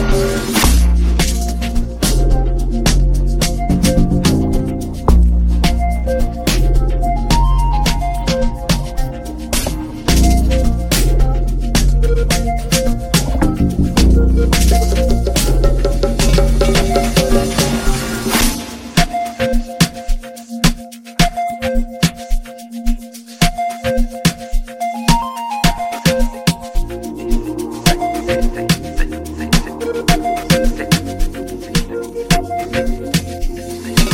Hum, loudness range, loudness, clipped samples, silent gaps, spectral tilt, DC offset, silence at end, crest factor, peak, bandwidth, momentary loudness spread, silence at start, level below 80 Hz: none; 5 LU; -16 LUFS; under 0.1%; none; -5 dB/octave; under 0.1%; 0 s; 14 dB; 0 dBFS; 17 kHz; 10 LU; 0 s; -16 dBFS